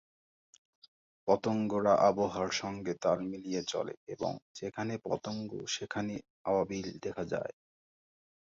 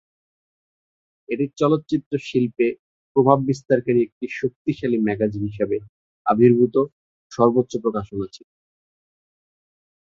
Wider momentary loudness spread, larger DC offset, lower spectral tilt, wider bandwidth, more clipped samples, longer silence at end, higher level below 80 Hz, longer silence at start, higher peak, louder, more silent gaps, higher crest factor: about the same, 12 LU vs 11 LU; neither; second, -5 dB/octave vs -8 dB/octave; about the same, 7.8 kHz vs 7.6 kHz; neither; second, 0.95 s vs 1.7 s; second, -66 dBFS vs -56 dBFS; about the same, 1.25 s vs 1.3 s; second, -12 dBFS vs -2 dBFS; second, -34 LUFS vs -21 LUFS; second, 3.97-4.07 s, 4.42-4.55 s, 6.30-6.45 s vs 2.06-2.11 s, 2.79-3.15 s, 4.12-4.21 s, 4.56-4.65 s, 5.89-6.25 s, 6.92-7.30 s; about the same, 22 dB vs 20 dB